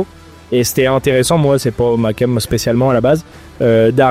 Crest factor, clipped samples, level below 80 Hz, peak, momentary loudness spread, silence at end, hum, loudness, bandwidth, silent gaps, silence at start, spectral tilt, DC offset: 12 dB; under 0.1%; -38 dBFS; 0 dBFS; 5 LU; 0 s; none; -14 LUFS; 16.5 kHz; none; 0 s; -5.5 dB/octave; under 0.1%